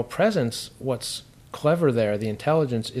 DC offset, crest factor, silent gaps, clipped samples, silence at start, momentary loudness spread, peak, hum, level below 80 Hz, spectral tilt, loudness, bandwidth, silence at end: under 0.1%; 16 dB; none; under 0.1%; 0 s; 10 LU; -8 dBFS; none; -58 dBFS; -5.5 dB/octave; -24 LUFS; 15.5 kHz; 0 s